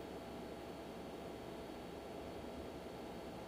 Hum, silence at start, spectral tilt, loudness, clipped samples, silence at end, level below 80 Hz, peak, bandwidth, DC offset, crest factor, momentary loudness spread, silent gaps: none; 0 s; -5.5 dB/octave; -50 LUFS; under 0.1%; 0 s; -64 dBFS; -36 dBFS; 15.5 kHz; under 0.1%; 12 dB; 1 LU; none